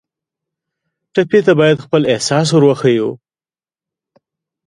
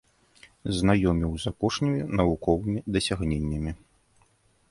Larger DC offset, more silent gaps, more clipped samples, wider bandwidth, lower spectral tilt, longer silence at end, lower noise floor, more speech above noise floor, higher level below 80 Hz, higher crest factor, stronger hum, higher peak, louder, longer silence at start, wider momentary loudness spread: neither; neither; neither; about the same, 11.5 kHz vs 11.5 kHz; about the same, -5.5 dB/octave vs -6 dB/octave; first, 1.5 s vs 0.95 s; first, under -90 dBFS vs -64 dBFS; first, over 78 dB vs 39 dB; second, -58 dBFS vs -40 dBFS; about the same, 16 dB vs 20 dB; neither; first, 0 dBFS vs -8 dBFS; first, -13 LUFS vs -26 LUFS; first, 1.15 s vs 0.65 s; about the same, 7 LU vs 9 LU